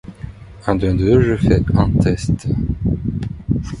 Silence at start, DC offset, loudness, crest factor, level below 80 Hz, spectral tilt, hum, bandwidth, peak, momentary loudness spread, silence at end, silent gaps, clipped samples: 0.05 s; under 0.1%; -17 LUFS; 16 dB; -28 dBFS; -8 dB/octave; none; 11 kHz; 0 dBFS; 12 LU; 0 s; none; under 0.1%